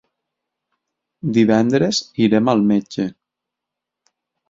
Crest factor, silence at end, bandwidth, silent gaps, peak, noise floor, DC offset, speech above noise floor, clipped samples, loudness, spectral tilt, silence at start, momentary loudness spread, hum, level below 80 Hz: 18 dB; 1.4 s; 7.6 kHz; none; -2 dBFS; -83 dBFS; under 0.1%; 67 dB; under 0.1%; -17 LUFS; -5.5 dB/octave; 1.25 s; 11 LU; none; -58 dBFS